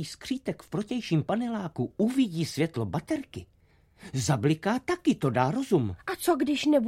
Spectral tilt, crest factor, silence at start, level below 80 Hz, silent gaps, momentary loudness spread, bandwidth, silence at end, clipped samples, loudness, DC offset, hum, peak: -6 dB/octave; 18 dB; 0 s; -60 dBFS; none; 8 LU; 16 kHz; 0 s; under 0.1%; -28 LUFS; under 0.1%; none; -10 dBFS